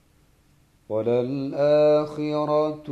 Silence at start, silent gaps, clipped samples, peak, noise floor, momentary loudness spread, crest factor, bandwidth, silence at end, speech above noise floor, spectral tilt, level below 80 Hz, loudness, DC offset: 0.9 s; none; under 0.1%; -10 dBFS; -60 dBFS; 9 LU; 12 dB; 7.4 kHz; 0 s; 38 dB; -8 dB/octave; -62 dBFS; -23 LUFS; under 0.1%